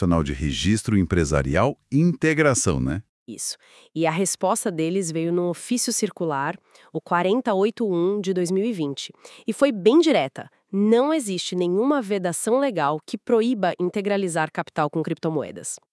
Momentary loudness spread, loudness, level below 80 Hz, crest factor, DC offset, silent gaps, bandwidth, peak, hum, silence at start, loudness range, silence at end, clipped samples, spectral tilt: 11 LU; -23 LUFS; -44 dBFS; 18 dB; under 0.1%; 3.09-3.26 s; 12 kHz; -4 dBFS; none; 0 s; 3 LU; 0.15 s; under 0.1%; -5 dB/octave